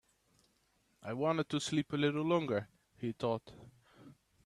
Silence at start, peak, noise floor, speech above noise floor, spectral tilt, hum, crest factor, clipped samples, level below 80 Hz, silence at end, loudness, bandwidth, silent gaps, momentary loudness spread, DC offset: 1.05 s; -18 dBFS; -75 dBFS; 40 dB; -5.5 dB/octave; none; 20 dB; under 0.1%; -74 dBFS; 0.35 s; -36 LUFS; 12.5 kHz; none; 11 LU; under 0.1%